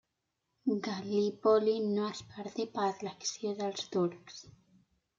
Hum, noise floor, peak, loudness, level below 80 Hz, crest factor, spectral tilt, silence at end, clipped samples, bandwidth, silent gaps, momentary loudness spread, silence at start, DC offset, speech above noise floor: none; -84 dBFS; -14 dBFS; -33 LUFS; -78 dBFS; 20 dB; -5 dB/octave; 0.7 s; under 0.1%; 7.6 kHz; none; 14 LU; 0.65 s; under 0.1%; 51 dB